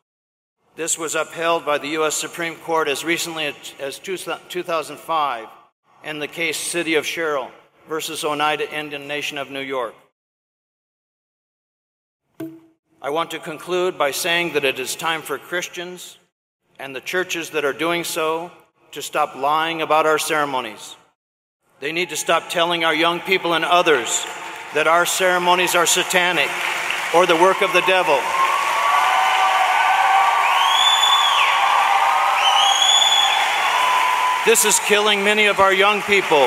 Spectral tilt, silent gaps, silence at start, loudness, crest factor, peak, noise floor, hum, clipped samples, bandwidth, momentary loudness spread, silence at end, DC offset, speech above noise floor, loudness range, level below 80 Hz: -1.5 dB/octave; 5.72-5.83 s, 10.12-12.20 s, 12.79-12.83 s, 16.32-16.60 s, 21.15-21.60 s; 0.8 s; -18 LUFS; 20 dB; 0 dBFS; under -90 dBFS; none; under 0.1%; 16 kHz; 15 LU; 0 s; under 0.1%; over 70 dB; 11 LU; -68 dBFS